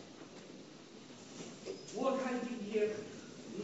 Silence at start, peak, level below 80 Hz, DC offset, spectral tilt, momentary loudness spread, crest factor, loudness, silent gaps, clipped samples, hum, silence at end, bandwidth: 0 s; -22 dBFS; -80 dBFS; under 0.1%; -4 dB/octave; 17 LU; 20 dB; -40 LUFS; none; under 0.1%; none; 0 s; 8 kHz